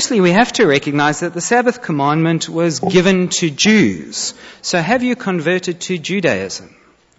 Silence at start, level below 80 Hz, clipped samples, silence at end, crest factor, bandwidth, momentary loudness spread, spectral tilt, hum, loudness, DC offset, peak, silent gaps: 0 s; -52 dBFS; under 0.1%; 0.5 s; 14 dB; 8 kHz; 9 LU; -4.5 dB/octave; none; -15 LUFS; under 0.1%; -2 dBFS; none